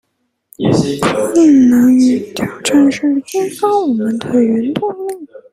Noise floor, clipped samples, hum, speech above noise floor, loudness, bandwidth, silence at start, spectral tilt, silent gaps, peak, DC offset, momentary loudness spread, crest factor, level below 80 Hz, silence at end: -49 dBFS; under 0.1%; none; 37 dB; -13 LUFS; 15 kHz; 0.6 s; -5.5 dB/octave; none; 0 dBFS; under 0.1%; 11 LU; 12 dB; -50 dBFS; 0.15 s